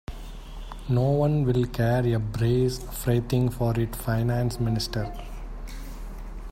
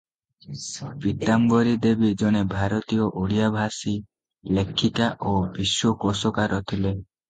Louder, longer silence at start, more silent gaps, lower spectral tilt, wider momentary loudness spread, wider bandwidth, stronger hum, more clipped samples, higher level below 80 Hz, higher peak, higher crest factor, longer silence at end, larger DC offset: about the same, -25 LUFS vs -23 LUFS; second, 0.1 s vs 0.5 s; neither; first, -7 dB/octave vs -5.5 dB/octave; first, 18 LU vs 11 LU; first, 16 kHz vs 9.4 kHz; neither; neither; first, -38 dBFS vs -46 dBFS; second, -10 dBFS vs -6 dBFS; about the same, 16 dB vs 18 dB; second, 0 s vs 0.25 s; neither